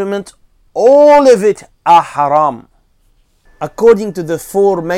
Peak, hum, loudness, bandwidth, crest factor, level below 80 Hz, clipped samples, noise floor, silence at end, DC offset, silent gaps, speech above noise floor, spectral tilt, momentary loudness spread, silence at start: 0 dBFS; none; -10 LUFS; 15.5 kHz; 12 dB; -48 dBFS; 0.6%; -53 dBFS; 0 s; under 0.1%; none; 43 dB; -5.5 dB/octave; 16 LU; 0 s